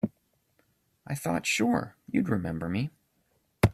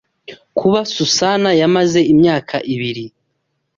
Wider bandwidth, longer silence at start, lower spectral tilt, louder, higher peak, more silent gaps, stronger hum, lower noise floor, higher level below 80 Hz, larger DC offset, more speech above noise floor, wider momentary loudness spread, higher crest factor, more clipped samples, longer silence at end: first, 14.5 kHz vs 7.6 kHz; second, 0.05 s vs 0.3 s; about the same, -5.5 dB/octave vs -4.5 dB/octave; second, -30 LUFS vs -14 LUFS; second, -6 dBFS vs -2 dBFS; neither; neither; about the same, -72 dBFS vs -70 dBFS; about the same, -52 dBFS vs -54 dBFS; neither; second, 43 dB vs 56 dB; second, 9 LU vs 12 LU; first, 24 dB vs 14 dB; neither; second, 0 s vs 0.7 s